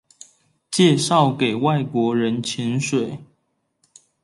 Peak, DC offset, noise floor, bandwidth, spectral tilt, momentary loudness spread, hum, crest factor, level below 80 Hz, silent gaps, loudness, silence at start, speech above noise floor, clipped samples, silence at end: -4 dBFS; under 0.1%; -70 dBFS; 11.5 kHz; -5 dB/octave; 9 LU; none; 18 dB; -66 dBFS; none; -20 LUFS; 0.7 s; 51 dB; under 0.1%; 1 s